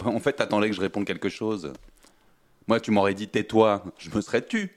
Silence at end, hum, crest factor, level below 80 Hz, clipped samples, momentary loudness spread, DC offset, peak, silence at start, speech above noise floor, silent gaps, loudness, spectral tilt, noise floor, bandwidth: 0.1 s; none; 22 dB; -60 dBFS; under 0.1%; 10 LU; under 0.1%; -4 dBFS; 0 s; 35 dB; none; -25 LUFS; -5.5 dB/octave; -60 dBFS; 12.5 kHz